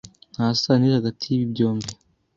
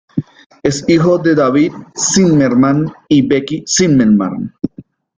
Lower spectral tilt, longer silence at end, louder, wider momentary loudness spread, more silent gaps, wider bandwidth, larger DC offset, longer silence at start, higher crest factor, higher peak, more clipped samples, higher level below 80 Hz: first, -6.5 dB/octave vs -5 dB/octave; about the same, 0.4 s vs 0.35 s; second, -22 LUFS vs -12 LUFS; about the same, 12 LU vs 12 LU; second, none vs 0.46-0.50 s; second, 8 kHz vs 9.6 kHz; neither; about the same, 0.05 s vs 0.15 s; first, 18 dB vs 12 dB; second, -4 dBFS vs 0 dBFS; neither; second, -58 dBFS vs -46 dBFS